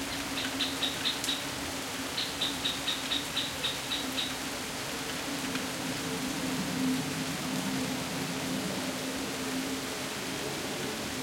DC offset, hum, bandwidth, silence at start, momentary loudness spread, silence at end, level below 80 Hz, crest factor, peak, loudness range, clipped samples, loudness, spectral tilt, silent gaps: under 0.1%; none; 16.5 kHz; 0 s; 5 LU; 0 s; -58 dBFS; 20 dB; -14 dBFS; 2 LU; under 0.1%; -32 LUFS; -2.5 dB/octave; none